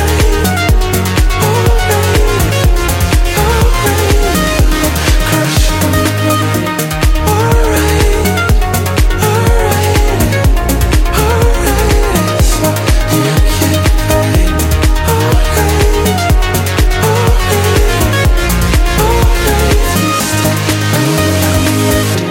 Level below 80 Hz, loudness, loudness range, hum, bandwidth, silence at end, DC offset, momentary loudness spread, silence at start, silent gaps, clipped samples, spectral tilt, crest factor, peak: -14 dBFS; -11 LUFS; 0 LU; none; 17 kHz; 0 s; under 0.1%; 2 LU; 0 s; none; under 0.1%; -4.5 dB/octave; 10 dB; 0 dBFS